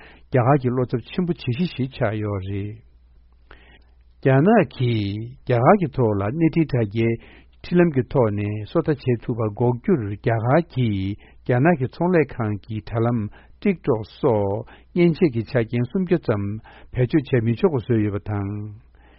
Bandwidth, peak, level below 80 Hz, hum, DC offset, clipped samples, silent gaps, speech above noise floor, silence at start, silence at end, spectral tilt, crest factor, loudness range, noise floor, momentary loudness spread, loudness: 5.8 kHz; -2 dBFS; -46 dBFS; none; under 0.1%; under 0.1%; none; 31 dB; 0.3 s; 0.4 s; -7.5 dB/octave; 20 dB; 3 LU; -52 dBFS; 10 LU; -22 LUFS